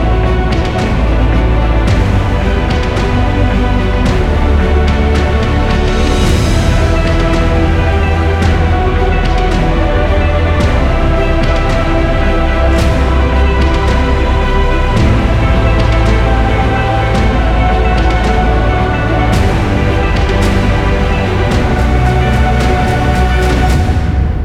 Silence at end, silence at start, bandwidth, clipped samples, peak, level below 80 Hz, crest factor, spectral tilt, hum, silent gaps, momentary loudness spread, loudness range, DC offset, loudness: 0 s; 0 s; 11.5 kHz; under 0.1%; 0 dBFS; -14 dBFS; 10 dB; -6.5 dB/octave; none; none; 2 LU; 1 LU; 0.6%; -12 LUFS